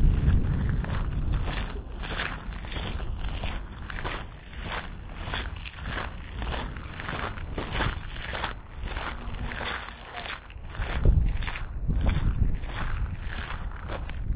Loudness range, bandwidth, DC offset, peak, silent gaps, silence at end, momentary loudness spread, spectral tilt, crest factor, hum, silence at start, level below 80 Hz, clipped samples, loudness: 5 LU; 4 kHz; under 0.1%; -10 dBFS; none; 0 s; 10 LU; -9.5 dB/octave; 18 dB; none; 0 s; -32 dBFS; under 0.1%; -32 LUFS